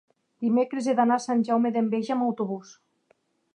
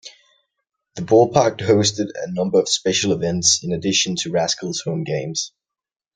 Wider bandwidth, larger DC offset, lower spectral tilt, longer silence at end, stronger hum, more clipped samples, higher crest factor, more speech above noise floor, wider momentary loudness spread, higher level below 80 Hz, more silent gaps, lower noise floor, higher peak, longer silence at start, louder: about the same, 9.8 kHz vs 10.5 kHz; neither; first, -6 dB/octave vs -3.5 dB/octave; first, 0.95 s vs 0.65 s; neither; neither; about the same, 16 dB vs 20 dB; second, 43 dB vs 69 dB; about the same, 8 LU vs 10 LU; second, -80 dBFS vs -58 dBFS; neither; second, -68 dBFS vs -88 dBFS; second, -10 dBFS vs 0 dBFS; first, 0.4 s vs 0.05 s; second, -25 LUFS vs -19 LUFS